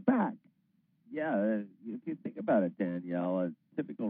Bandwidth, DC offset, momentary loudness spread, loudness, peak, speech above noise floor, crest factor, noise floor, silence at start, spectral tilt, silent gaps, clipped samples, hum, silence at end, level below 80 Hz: 3.8 kHz; under 0.1%; 12 LU; -34 LUFS; -14 dBFS; 40 dB; 20 dB; -73 dBFS; 0 s; -7.5 dB/octave; none; under 0.1%; none; 0 s; under -90 dBFS